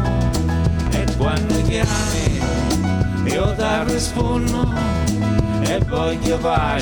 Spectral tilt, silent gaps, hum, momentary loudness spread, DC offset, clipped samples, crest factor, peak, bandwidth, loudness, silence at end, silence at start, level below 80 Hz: -5.5 dB/octave; none; none; 1 LU; under 0.1%; under 0.1%; 16 dB; -2 dBFS; over 20 kHz; -19 LUFS; 0 s; 0 s; -26 dBFS